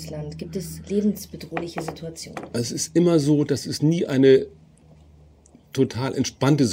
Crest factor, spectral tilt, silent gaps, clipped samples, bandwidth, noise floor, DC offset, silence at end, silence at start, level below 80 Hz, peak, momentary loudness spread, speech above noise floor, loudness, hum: 18 dB; -6 dB/octave; none; under 0.1%; 16 kHz; -52 dBFS; under 0.1%; 0 s; 0 s; -54 dBFS; -4 dBFS; 16 LU; 30 dB; -23 LUFS; none